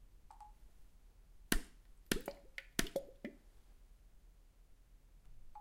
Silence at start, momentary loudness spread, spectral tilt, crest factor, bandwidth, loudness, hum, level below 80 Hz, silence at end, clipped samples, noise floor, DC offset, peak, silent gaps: 0 s; 24 LU; -3 dB/octave; 32 dB; 16 kHz; -43 LUFS; none; -52 dBFS; 0 s; under 0.1%; -63 dBFS; under 0.1%; -14 dBFS; none